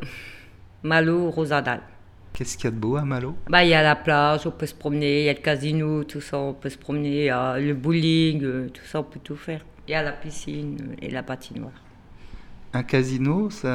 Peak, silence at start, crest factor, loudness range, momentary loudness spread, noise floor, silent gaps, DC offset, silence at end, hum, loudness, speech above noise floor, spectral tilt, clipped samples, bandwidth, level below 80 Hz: 0 dBFS; 0 s; 24 dB; 11 LU; 15 LU; -46 dBFS; none; under 0.1%; 0 s; none; -23 LUFS; 23 dB; -6 dB/octave; under 0.1%; 13.5 kHz; -48 dBFS